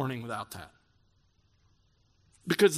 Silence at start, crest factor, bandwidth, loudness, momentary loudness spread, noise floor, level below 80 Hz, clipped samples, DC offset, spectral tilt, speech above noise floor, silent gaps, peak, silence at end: 0 s; 22 dB; 15.5 kHz; -33 LUFS; 19 LU; -69 dBFS; -70 dBFS; under 0.1%; under 0.1%; -4.5 dB/octave; 40 dB; none; -10 dBFS; 0 s